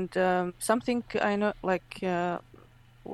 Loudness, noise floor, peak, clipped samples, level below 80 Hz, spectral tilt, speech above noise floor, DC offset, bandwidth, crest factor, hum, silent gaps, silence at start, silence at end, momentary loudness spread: -29 LUFS; -55 dBFS; -10 dBFS; under 0.1%; -60 dBFS; -5 dB/octave; 27 dB; under 0.1%; 12.5 kHz; 20 dB; none; none; 0 s; 0 s; 6 LU